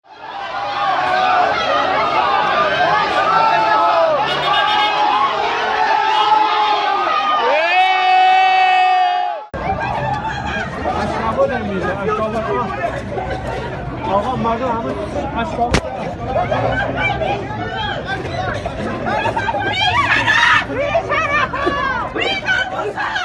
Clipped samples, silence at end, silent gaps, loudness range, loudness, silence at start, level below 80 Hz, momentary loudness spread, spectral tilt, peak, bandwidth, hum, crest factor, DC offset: under 0.1%; 0 s; none; 6 LU; -16 LUFS; 0.1 s; -38 dBFS; 10 LU; -4.5 dB/octave; 0 dBFS; 11.5 kHz; none; 16 dB; under 0.1%